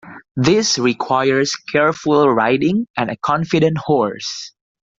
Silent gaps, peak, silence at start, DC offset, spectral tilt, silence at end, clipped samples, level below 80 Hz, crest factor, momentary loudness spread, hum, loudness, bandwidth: 0.31-0.35 s, 2.90-2.94 s; 0 dBFS; 0.05 s; under 0.1%; -4.5 dB/octave; 0.5 s; under 0.1%; -54 dBFS; 16 dB; 10 LU; none; -17 LUFS; 7.8 kHz